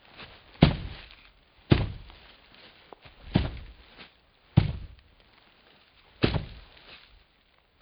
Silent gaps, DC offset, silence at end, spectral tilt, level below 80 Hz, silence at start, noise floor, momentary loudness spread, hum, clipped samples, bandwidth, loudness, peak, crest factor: none; under 0.1%; 0.85 s; -11 dB/octave; -42 dBFS; 0.2 s; -65 dBFS; 27 LU; none; under 0.1%; 5.4 kHz; -28 LUFS; 0 dBFS; 32 dB